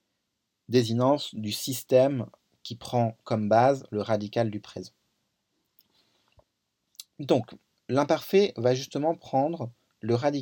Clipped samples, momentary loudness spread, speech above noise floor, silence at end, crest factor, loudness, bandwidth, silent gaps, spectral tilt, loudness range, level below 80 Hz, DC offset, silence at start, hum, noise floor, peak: under 0.1%; 19 LU; 55 dB; 0 s; 20 dB; -26 LUFS; 17.5 kHz; none; -6 dB/octave; 9 LU; -72 dBFS; under 0.1%; 0.7 s; none; -80 dBFS; -8 dBFS